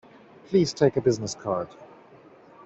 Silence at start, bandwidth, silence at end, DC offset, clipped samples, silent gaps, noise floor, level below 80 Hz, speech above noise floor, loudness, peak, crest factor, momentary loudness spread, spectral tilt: 0.5 s; 8.2 kHz; 0.8 s; under 0.1%; under 0.1%; none; -52 dBFS; -60 dBFS; 28 dB; -25 LUFS; -8 dBFS; 20 dB; 9 LU; -6 dB/octave